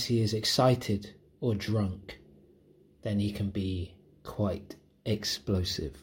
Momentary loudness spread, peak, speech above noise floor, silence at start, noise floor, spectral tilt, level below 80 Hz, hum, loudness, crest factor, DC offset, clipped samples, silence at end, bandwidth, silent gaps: 19 LU; -12 dBFS; 31 dB; 0 s; -61 dBFS; -5.5 dB/octave; -56 dBFS; none; -31 LUFS; 20 dB; under 0.1%; under 0.1%; 0 s; 16.5 kHz; none